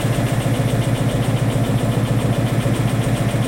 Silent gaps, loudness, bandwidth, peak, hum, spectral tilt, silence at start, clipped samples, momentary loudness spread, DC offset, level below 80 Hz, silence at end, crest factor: none; -19 LUFS; 16.5 kHz; -6 dBFS; none; -6.5 dB/octave; 0 s; under 0.1%; 0 LU; under 0.1%; -34 dBFS; 0 s; 12 dB